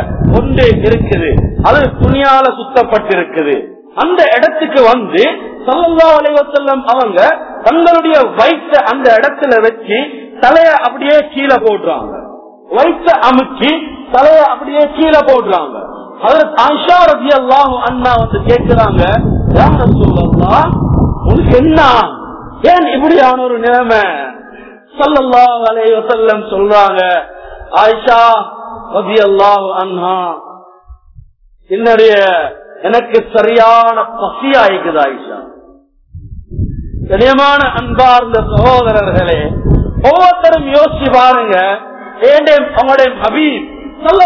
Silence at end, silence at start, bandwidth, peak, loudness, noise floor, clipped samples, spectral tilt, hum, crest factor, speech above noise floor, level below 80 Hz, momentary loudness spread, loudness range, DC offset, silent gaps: 0 s; 0 s; 6 kHz; 0 dBFS; -9 LUFS; -43 dBFS; 3%; -7.5 dB/octave; none; 8 dB; 35 dB; -26 dBFS; 10 LU; 3 LU; under 0.1%; none